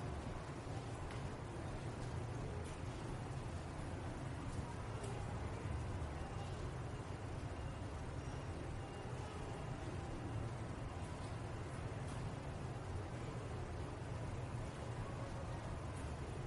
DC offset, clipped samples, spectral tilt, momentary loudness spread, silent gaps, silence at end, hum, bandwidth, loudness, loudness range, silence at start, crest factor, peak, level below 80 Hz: under 0.1%; under 0.1%; -6.5 dB/octave; 2 LU; none; 0 s; none; 11.5 kHz; -47 LUFS; 1 LU; 0 s; 14 dB; -32 dBFS; -52 dBFS